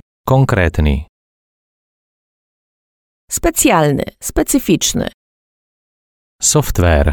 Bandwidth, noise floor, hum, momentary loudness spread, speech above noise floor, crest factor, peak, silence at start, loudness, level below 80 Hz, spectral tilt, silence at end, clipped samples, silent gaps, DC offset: over 20 kHz; under -90 dBFS; none; 9 LU; over 77 dB; 16 dB; 0 dBFS; 0.25 s; -14 LUFS; -26 dBFS; -4.5 dB/octave; 0 s; under 0.1%; 1.09-3.28 s, 5.14-6.39 s; under 0.1%